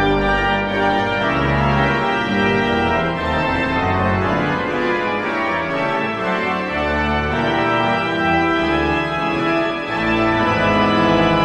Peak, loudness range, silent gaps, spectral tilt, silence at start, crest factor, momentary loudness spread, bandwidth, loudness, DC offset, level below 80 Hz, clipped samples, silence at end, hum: -4 dBFS; 2 LU; none; -6.5 dB/octave; 0 s; 14 dB; 4 LU; 10.5 kHz; -18 LUFS; under 0.1%; -36 dBFS; under 0.1%; 0 s; none